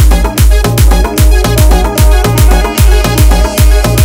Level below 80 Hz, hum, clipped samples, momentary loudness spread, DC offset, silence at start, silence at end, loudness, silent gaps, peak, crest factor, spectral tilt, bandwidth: -6 dBFS; none; 7%; 1 LU; under 0.1%; 0 s; 0 s; -8 LUFS; none; 0 dBFS; 6 dB; -5 dB/octave; 16.5 kHz